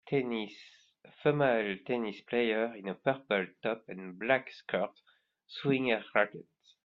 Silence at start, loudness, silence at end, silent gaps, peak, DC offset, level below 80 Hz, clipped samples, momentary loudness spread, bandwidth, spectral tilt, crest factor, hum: 0.05 s; -32 LUFS; 0.45 s; none; -10 dBFS; under 0.1%; -74 dBFS; under 0.1%; 11 LU; 7 kHz; -7.5 dB/octave; 22 dB; none